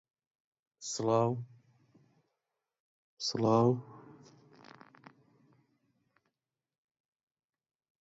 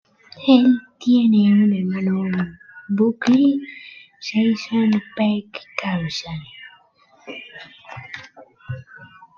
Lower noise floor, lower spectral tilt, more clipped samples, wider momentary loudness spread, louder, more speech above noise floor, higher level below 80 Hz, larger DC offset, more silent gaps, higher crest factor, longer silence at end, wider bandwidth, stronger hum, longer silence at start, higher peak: first, -90 dBFS vs -55 dBFS; about the same, -6 dB/octave vs -7 dB/octave; neither; about the same, 24 LU vs 22 LU; second, -31 LUFS vs -19 LUFS; first, 60 dB vs 37 dB; second, -76 dBFS vs -60 dBFS; neither; first, 2.80-3.17 s vs none; about the same, 22 dB vs 18 dB; first, 3.9 s vs 0.35 s; first, 8 kHz vs 7 kHz; neither; first, 0.8 s vs 0.35 s; second, -16 dBFS vs -2 dBFS